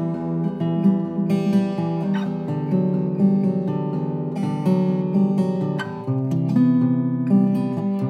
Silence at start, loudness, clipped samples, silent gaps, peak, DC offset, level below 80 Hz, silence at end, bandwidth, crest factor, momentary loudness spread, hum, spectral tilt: 0 s; -21 LUFS; under 0.1%; none; -8 dBFS; under 0.1%; -66 dBFS; 0 s; 6.6 kHz; 14 dB; 7 LU; none; -9.5 dB/octave